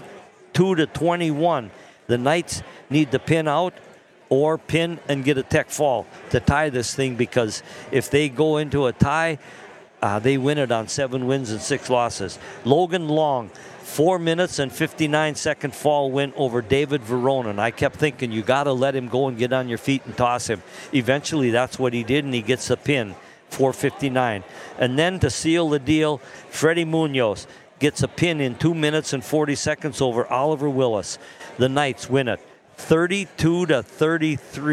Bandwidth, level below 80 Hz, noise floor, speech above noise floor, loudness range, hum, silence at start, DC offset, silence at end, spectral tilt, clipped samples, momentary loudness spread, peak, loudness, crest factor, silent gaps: 15 kHz; -50 dBFS; -44 dBFS; 23 dB; 1 LU; none; 0 s; under 0.1%; 0 s; -5 dB/octave; under 0.1%; 7 LU; 0 dBFS; -22 LUFS; 22 dB; none